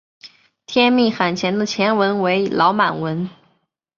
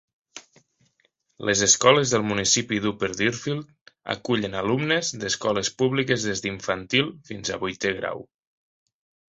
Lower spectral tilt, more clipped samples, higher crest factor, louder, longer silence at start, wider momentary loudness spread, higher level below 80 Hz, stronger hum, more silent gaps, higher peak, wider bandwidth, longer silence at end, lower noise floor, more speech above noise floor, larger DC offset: first, -5.5 dB/octave vs -3 dB/octave; neither; second, 18 dB vs 24 dB; first, -18 LUFS vs -23 LUFS; about the same, 0.25 s vs 0.35 s; second, 9 LU vs 14 LU; about the same, -62 dBFS vs -58 dBFS; neither; second, none vs 3.81-3.86 s; about the same, -2 dBFS vs -2 dBFS; second, 7.4 kHz vs 8.2 kHz; second, 0.7 s vs 1.1 s; about the same, -66 dBFS vs -69 dBFS; about the same, 48 dB vs 45 dB; neither